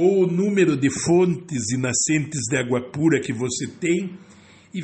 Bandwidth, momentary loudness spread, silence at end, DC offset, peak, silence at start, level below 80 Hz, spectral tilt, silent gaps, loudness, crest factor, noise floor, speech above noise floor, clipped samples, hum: 8.8 kHz; 7 LU; 0 s; under 0.1%; -6 dBFS; 0 s; -58 dBFS; -5 dB/octave; none; -21 LUFS; 16 dB; -42 dBFS; 21 dB; under 0.1%; none